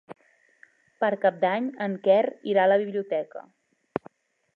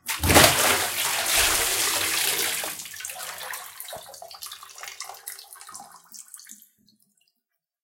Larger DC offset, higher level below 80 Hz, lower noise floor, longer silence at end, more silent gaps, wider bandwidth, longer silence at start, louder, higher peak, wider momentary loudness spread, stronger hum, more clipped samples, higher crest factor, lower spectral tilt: neither; second, -76 dBFS vs -46 dBFS; second, -59 dBFS vs -81 dBFS; second, 1.15 s vs 1.3 s; neither; second, 4.5 kHz vs 17 kHz; about the same, 0.1 s vs 0.05 s; second, -25 LUFS vs -21 LUFS; second, -8 dBFS vs -2 dBFS; second, 14 LU vs 25 LU; neither; neither; second, 18 dB vs 26 dB; first, -8 dB/octave vs -1.5 dB/octave